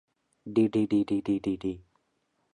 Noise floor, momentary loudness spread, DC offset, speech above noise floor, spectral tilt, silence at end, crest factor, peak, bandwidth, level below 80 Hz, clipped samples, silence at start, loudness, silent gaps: -75 dBFS; 14 LU; under 0.1%; 48 dB; -8 dB/octave; 0.75 s; 16 dB; -12 dBFS; 10 kHz; -60 dBFS; under 0.1%; 0.45 s; -28 LUFS; none